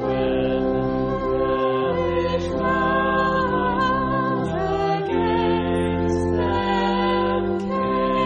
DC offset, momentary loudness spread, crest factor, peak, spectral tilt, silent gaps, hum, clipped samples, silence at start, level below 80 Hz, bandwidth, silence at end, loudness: under 0.1%; 3 LU; 12 dB; -8 dBFS; -7 dB/octave; none; none; under 0.1%; 0 s; -38 dBFS; 10 kHz; 0 s; -21 LUFS